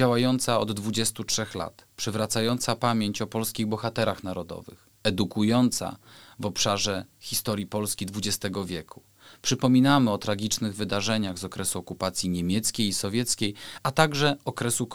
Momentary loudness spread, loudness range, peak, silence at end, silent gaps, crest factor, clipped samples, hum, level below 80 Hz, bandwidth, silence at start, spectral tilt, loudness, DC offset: 11 LU; 3 LU; -4 dBFS; 0 s; none; 24 dB; under 0.1%; none; -56 dBFS; over 20 kHz; 0 s; -4 dB/octave; -26 LUFS; 0.3%